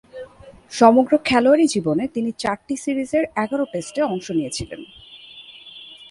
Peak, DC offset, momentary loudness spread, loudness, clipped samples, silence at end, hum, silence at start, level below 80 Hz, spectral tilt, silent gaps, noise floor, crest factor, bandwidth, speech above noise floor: 0 dBFS; under 0.1%; 24 LU; -19 LUFS; under 0.1%; 0.05 s; none; 0.15 s; -52 dBFS; -5 dB/octave; none; -44 dBFS; 20 dB; 11.5 kHz; 25 dB